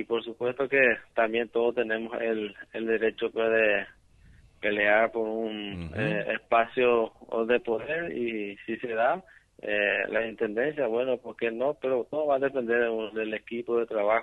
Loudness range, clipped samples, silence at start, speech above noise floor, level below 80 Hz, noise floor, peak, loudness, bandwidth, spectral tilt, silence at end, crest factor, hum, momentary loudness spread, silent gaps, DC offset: 2 LU; under 0.1%; 0 s; 29 dB; -62 dBFS; -56 dBFS; -8 dBFS; -28 LUFS; 4.4 kHz; -7 dB/octave; 0 s; 20 dB; none; 9 LU; none; under 0.1%